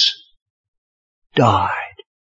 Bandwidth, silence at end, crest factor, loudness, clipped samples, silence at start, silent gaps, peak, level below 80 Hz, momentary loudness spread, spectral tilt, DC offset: 7.8 kHz; 0.45 s; 20 dB; -18 LUFS; under 0.1%; 0 s; 0.42-1.22 s; 0 dBFS; -58 dBFS; 18 LU; -4.5 dB/octave; under 0.1%